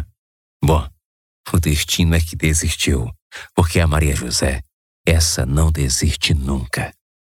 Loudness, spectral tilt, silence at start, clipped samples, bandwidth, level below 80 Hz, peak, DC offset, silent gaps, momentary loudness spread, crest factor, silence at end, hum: -18 LUFS; -4.5 dB/octave; 0 s; under 0.1%; 17 kHz; -24 dBFS; -4 dBFS; under 0.1%; 0.19-0.60 s, 1.05-1.44 s, 3.22-3.30 s, 4.74-5.04 s; 12 LU; 16 dB; 0.3 s; none